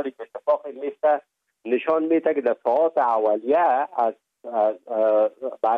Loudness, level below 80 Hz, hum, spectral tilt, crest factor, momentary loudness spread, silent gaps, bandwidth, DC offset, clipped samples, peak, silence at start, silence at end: -22 LUFS; -78 dBFS; none; -7 dB/octave; 12 dB; 9 LU; none; 4.6 kHz; under 0.1%; under 0.1%; -10 dBFS; 0 s; 0 s